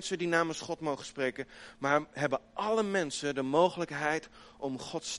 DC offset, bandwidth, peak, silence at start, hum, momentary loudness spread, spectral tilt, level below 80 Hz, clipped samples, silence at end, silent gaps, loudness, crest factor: under 0.1%; 11.5 kHz; -12 dBFS; 0 s; none; 10 LU; -4 dB/octave; -66 dBFS; under 0.1%; 0 s; none; -32 LUFS; 20 dB